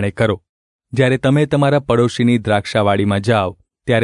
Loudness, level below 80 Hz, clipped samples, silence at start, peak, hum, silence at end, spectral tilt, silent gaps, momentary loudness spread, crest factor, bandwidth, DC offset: -16 LUFS; -48 dBFS; under 0.1%; 0 s; -2 dBFS; none; 0 s; -7 dB/octave; 0.49-0.79 s; 8 LU; 14 dB; 11 kHz; under 0.1%